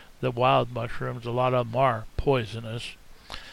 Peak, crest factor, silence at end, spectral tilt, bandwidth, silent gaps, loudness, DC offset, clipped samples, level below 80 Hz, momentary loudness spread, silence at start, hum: -10 dBFS; 18 dB; 0 s; -6.5 dB/octave; 13.5 kHz; none; -26 LUFS; under 0.1%; under 0.1%; -44 dBFS; 14 LU; 0 s; none